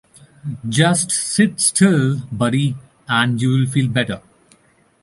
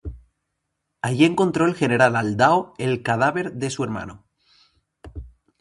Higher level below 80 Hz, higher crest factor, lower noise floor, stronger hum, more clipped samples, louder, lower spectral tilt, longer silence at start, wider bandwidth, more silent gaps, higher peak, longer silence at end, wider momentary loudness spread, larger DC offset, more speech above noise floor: second, -54 dBFS vs -46 dBFS; second, 16 dB vs 22 dB; second, -56 dBFS vs -77 dBFS; neither; neither; first, -17 LUFS vs -20 LUFS; second, -4.5 dB/octave vs -6 dB/octave; first, 0.45 s vs 0.05 s; about the same, 11.5 kHz vs 11.5 kHz; neither; about the same, -2 dBFS vs 0 dBFS; first, 0.85 s vs 0.35 s; second, 14 LU vs 22 LU; neither; second, 39 dB vs 57 dB